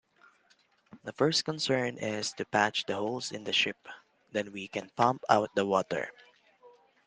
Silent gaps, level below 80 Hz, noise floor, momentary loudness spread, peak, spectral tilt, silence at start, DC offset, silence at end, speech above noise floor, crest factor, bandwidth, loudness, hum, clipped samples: none; -74 dBFS; -68 dBFS; 11 LU; -6 dBFS; -3.5 dB/octave; 0.95 s; under 0.1%; 0.4 s; 37 dB; 26 dB; 10 kHz; -30 LUFS; none; under 0.1%